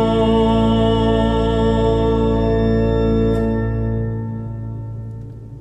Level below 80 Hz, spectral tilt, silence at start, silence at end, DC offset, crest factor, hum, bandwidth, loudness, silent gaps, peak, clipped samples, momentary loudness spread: -26 dBFS; -8.5 dB/octave; 0 s; 0 s; under 0.1%; 14 dB; none; 8.8 kHz; -17 LUFS; none; -4 dBFS; under 0.1%; 14 LU